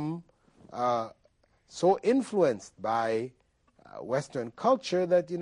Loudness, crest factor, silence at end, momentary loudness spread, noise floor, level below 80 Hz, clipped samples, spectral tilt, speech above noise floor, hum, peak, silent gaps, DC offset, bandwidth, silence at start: -29 LUFS; 18 dB; 0 s; 16 LU; -67 dBFS; -70 dBFS; under 0.1%; -6 dB/octave; 39 dB; none; -12 dBFS; none; under 0.1%; 11 kHz; 0 s